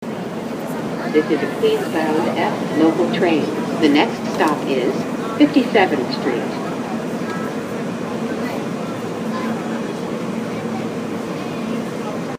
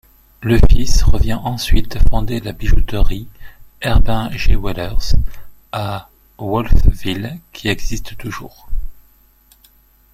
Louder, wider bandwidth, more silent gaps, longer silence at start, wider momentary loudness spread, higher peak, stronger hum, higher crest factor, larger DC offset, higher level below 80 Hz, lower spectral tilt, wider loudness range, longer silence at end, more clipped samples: about the same, -20 LUFS vs -20 LUFS; first, 15.5 kHz vs 13 kHz; neither; second, 0 s vs 0.4 s; second, 9 LU vs 14 LU; about the same, 0 dBFS vs 0 dBFS; neither; first, 20 dB vs 12 dB; neither; second, -60 dBFS vs -16 dBFS; about the same, -5.5 dB/octave vs -5.5 dB/octave; first, 7 LU vs 4 LU; second, 0 s vs 1.2 s; second, under 0.1% vs 0.1%